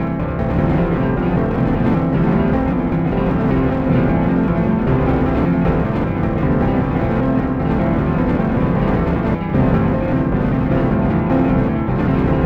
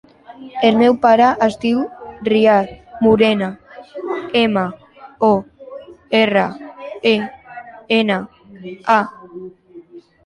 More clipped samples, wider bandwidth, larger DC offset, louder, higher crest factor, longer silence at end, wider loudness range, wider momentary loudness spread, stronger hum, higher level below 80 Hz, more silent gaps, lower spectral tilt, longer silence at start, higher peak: neither; second, 5.4 kHz vs 10.5 kHz; first, 0.4% vs under 0.1%; about the same, -17 LUFS vs -16 LUFS; about the same, 12 dB vs 16 dB; second, 0 s vs 0.25 s; second, 1 LU vs 5 LU; second, 2 LU vs 23 LU; neither; first, -26 dBFS vs -54 dBFS; neither; first, -10.5 dB/octave vs -6.5 dB/octave; second, 0 s vs 0.3 s; about the same, -4 dBFS vs -2 dBFS